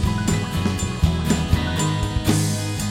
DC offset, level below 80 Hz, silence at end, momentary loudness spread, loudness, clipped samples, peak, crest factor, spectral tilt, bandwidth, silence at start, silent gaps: under 0.1%; -30 dBFS; 0 s; 3 LU; -22 LUFS; under 0.1%; -4 dBFS; 16 dB; -5 dB/octave; 17 kHz; 0 s; none